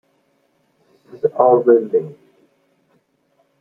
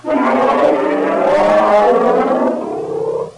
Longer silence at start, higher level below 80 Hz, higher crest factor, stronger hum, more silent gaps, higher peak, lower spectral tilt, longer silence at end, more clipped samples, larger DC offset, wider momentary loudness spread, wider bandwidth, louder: first, 1.15 s vs 0.05 s; second, -68 dBFS vs -50 dBFS; first, 18 dB vs 10 dB; neither; neither; about the same, -2 dBFS vs -2 dBFS; first, -10.5 dB/octave vs -6 dB/octave; first, 1.5 s vs 0.05 s; neither; neither; about the same, 10 LU vs 9 LU; second, 2.5 kHz vs 11 kHz; second, -16 LUFS vs -13 LUFS